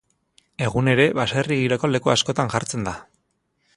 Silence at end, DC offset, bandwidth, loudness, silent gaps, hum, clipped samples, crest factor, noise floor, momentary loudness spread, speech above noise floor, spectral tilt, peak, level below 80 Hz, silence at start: 0.75 s; under 0.1%; 11.5 kHz; -21 LUFS; none; none; under 0.1%; 20 dB; -71 dBFS; 11 LU; 50 dB; -5 dB/octave; -2 dBFS; -52 dBFS; 0.6 s